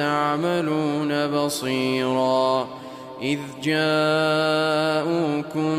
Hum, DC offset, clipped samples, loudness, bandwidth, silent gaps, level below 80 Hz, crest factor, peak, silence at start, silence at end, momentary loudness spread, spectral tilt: none; under 0.1%; under 0.1%; -22 LUFS; 15.5 kHz; none; -66 dBFS; 14 dB; -10 dBFS; 0 s; 0 s; 7 LU; -5 dB/octave